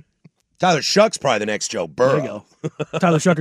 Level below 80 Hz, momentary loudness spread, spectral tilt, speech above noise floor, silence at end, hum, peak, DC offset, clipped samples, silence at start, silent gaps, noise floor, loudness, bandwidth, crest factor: -64 dBFS; 13 LU; -4.5 dB/octave; 36 dB; 0 s; none; -2 dBFS; under 0.1%; under 0.1%; 0.6 s; none; -55 dBFS; -19 LUFS; 14 kHz; 16 dB